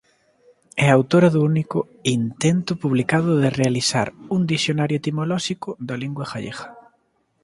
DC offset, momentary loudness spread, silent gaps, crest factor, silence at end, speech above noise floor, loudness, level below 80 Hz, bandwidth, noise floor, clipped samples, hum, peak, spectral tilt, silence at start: under 0.1%; 13 LU; none; 20 dB; 0.65 s; 46 dB; -21 LUFS; -58 dBFS; 11.5 kHz; -66 dBFS; under 0.1%; none; 0 dBFS; -5.5 dB/octave; 0.75 s